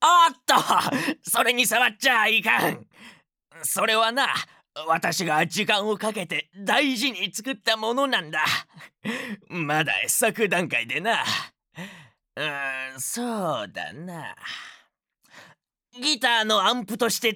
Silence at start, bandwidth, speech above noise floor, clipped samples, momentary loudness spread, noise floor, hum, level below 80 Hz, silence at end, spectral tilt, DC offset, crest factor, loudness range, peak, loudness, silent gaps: 0 s; over 20 kHz; 41 dB; under 0.1%; 16 LU; -66 dBFS; none; -80 dBFS; 0 s; -2 dB/octave; under 0.1%; 18 dB; 9 LU; -6 dBFS; -23 LUFS; none